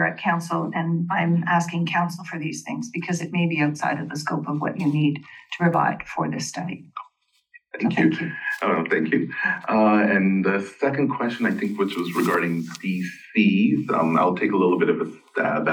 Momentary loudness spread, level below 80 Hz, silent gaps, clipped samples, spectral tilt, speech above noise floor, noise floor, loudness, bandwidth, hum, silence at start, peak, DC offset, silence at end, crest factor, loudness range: 10 LU; -70 dBFS; none; under 0.1%; -6.5 dB/octave; 38 dB; -60 dBFS; -23 LUFS; 19 kHz; none; 0 s; -6 dBFS; under 0.1%; 0 s; 16 dB; 4 LU